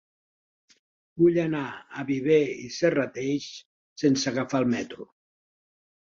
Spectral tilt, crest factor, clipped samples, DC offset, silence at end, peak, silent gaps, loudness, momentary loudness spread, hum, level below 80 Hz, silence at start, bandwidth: -5.5 dB/octave; 18 dB; under 0.1%; under 0.1%; 1.1 s; -10 dBFS; 3.65-3.96 s; -26 LUFS; 16 LU; none; -66 dBFS; 1.15 s; 7.6 kHz